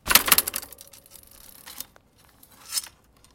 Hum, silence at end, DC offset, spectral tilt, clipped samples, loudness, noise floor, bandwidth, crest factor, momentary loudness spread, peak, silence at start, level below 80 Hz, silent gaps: none; 0.45 s; under 0.1%; 0.5 dB/octave; under 0.1%; -21 LUFS; -57 dBFS; 17 kHz; 28 dB; 29 LU; 0 dBFS; 0.05 s; -52 dBFS; none